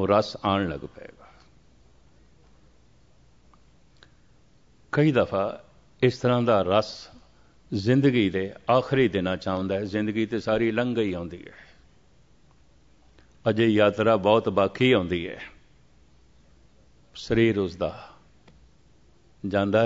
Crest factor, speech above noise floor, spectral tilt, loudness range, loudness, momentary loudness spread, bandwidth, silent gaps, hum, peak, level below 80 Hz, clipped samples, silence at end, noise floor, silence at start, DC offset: 22 dB; 36 dB; -7 dB/octave; 7 LU; -24 LUFS; 17 LU; 7.8 kHz; none; none; -6 dBFS; -56 dBFS; under 0.1%; 0 s; -60 dBFS; 0 s; 0.1%